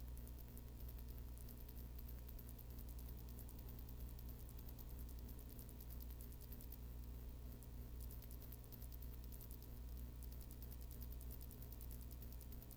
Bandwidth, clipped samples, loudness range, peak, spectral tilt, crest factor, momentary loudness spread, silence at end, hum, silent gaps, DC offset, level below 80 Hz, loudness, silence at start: over 20 kHz; under 0.1%; 1 LU; -34 dBFS; -5.5 dB/octave; 20 dB; 2 LU; 0 s; 60 Hz at -55 dBFS; none; under 0.1%; -54 dBFS; -55 LUFS; 0 s